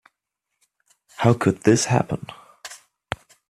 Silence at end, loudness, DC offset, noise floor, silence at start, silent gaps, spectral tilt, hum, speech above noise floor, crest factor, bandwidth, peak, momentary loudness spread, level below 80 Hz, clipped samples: 0.75 s; -20 LUFS; under 0.1%; -81 dBFS; 1.2 s; none; -5.5 dB/octave; none; 61 dB; 22 dB; 13 kHz; -2 dBFS; 21 LU; -54 dBFS; under 0.1%